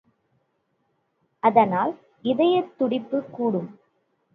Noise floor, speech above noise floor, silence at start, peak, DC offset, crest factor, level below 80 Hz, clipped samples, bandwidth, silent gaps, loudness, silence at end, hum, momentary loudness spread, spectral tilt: -72 dBFS; 50 dB; 1.45 s; -4 dBFS; under 0.1%; 22 dB; -72 dBFS; under 0.1%; 4.9 kHz; none; -23 LUFS; 0.65 s; none; 11 LU; -9 dB/octave